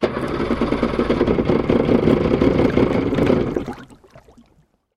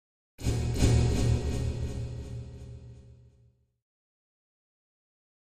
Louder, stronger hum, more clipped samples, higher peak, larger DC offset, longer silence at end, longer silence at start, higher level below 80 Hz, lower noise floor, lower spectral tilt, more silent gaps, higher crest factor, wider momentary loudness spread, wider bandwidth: first, -18 LUFS vs -30 LUFS; neither; neither; first, -2 dBFS vs -10 dBFS; neither; second, 1.05 s vs 2.45 s; second, 0 s vs 0.4 s; about the same, -34 dBFS vs -36 dBFS; second, -59 dBFS vs -64 dBFS; first, -8 dB/octave vs -6 dB/octave; neither; about the same, 18 dB vs 22 dB; second, 7 LU vs 21 LU; second, 11 kHz vs 14.5 kHz